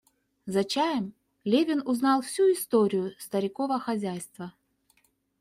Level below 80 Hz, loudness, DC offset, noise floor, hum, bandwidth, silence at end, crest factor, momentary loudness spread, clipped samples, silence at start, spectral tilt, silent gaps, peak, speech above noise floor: -72 dBFS; -27 LUFS; under 0.1%; -68 dBFS; none; 16 kHz; 0.9 s; 16 dB; 14 LU; under 0.1%; 0.45 s; -5 dB/octave; none; -12 dBFS; 42 dB